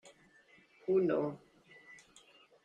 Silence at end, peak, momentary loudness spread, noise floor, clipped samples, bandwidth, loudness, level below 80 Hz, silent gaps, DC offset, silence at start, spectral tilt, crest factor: 0.7 s; -20 dBFS; 25 LU; -65 dBFS; under 0.1%; 9.2 kHz; -34 LUFS; -78 dBFS; none; under 0.1%; 0.05 s; -7.5 dB/octave; 18 dB